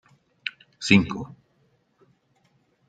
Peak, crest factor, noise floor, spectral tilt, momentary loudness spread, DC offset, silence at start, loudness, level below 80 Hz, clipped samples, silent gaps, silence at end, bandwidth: -2 dBFS; 26 dB; -66 dBFS; -5 dB/octave; 16 LU; under 0.1%; 0.45 s; -24 LUFS; -58 dBFS; under 0.1%; none; 1.6 s; 9.2 kHz